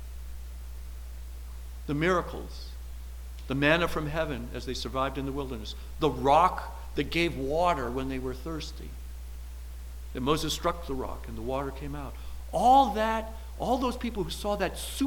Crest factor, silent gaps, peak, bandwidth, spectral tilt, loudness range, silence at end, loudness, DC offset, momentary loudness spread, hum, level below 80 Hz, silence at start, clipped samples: 20 dB; none; -10 dBFS; 19 kHz; -5 dB/octave; 6 LU; 0 s; -29 LUFS; under 0.1%; 20 LU; 60 Hz at -40 dBFS; -40 dBFS; 0 s; under 0.1%